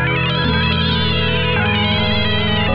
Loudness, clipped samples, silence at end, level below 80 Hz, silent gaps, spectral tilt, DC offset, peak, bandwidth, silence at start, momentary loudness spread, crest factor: -16 LUFS; under 0.1%; 0 s; -32 dBFS; none; -8 dB/octave; under 0.1%; -4 dBFS; 5.8 kHz; 0 s; 1 LU; 12 dB